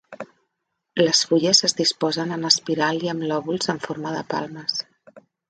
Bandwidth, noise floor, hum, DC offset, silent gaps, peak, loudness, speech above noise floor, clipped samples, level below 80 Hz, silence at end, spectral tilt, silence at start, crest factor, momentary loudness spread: 10 kHz; -78 dBFS; none; under 0.1%; none; 0 dBFS; -21 LUFS; 56 dB; under 0.1%; -68 dBFS; 0.3 s; -3 dB/octave; 0.1 s; 22 dB; 14 LU